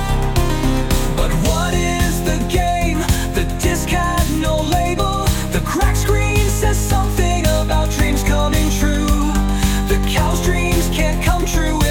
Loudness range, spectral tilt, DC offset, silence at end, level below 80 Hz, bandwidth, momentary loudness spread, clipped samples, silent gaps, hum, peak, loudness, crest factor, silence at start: 1 LU; -5 dB/octave; under 0.1%; 0 s; -20 dBFS; 18 kHz; 2 LU; under 0.1%; none; none; -2 dBFS; -17 LUFS; 14 dB; 0 s